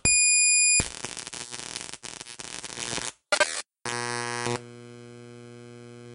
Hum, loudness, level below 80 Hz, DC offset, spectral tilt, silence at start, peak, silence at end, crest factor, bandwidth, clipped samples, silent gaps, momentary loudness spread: none; -24 LUFS; -52 dBFS; under 0.1%; -0.5 dB/octave; 0.05 s; -8 dBFS; 0 s; 20 dB; 11.5 kHz; under 0.1%; none; 28 LU